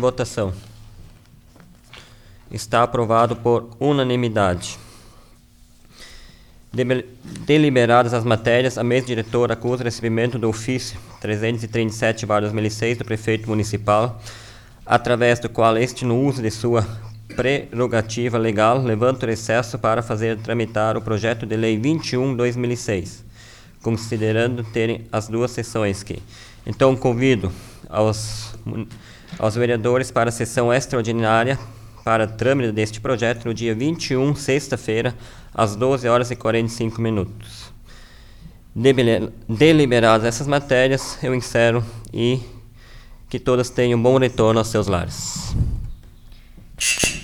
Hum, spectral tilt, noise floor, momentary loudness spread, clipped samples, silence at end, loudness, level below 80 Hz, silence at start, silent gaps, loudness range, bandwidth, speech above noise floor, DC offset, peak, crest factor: none; -5.5 dB/octave; -49 dBFS; 13 LU; under 0.1%; 0 s; -20 LUFS; -42 dBFS; 0 s; none; 4 LU; 17.5 kHz; 30 dB; under 0.1%; -2 dBFS; 18 dB